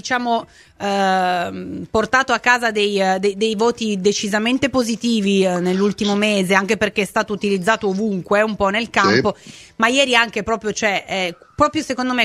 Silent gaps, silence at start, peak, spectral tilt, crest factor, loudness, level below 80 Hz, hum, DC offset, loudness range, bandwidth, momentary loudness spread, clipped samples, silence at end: none; 0.05 s; 0 dBFS; -4 dB/octave; 18 dB; -18 LUFS; -50 dBFS; none; under 0.1%; 1 LU; 14 kHz; 7 LU; under 0.1%; 0 s